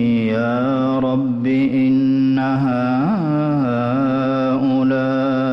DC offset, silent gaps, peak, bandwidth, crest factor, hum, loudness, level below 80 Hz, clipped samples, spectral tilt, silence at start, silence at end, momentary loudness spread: under 0.1%; none; -10 dBFS; 5.8 kHz; 8 dB; none; -17 LUFS; -54 dBFS; under 0.1%; -9.5 dB/octave; 0 s; 0 s; 3 LU